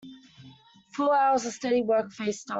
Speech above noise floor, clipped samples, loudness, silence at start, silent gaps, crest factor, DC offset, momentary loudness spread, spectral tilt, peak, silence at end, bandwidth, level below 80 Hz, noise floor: 28 dB; under 0.1%; -26 LUFS; 0.05 s; none; 14 dB; under 0.1%; 10 LU; -4 dB/octave; -14 dBFS; 0 s; 8.2 kHz; -70 dBFS; -53 dBFS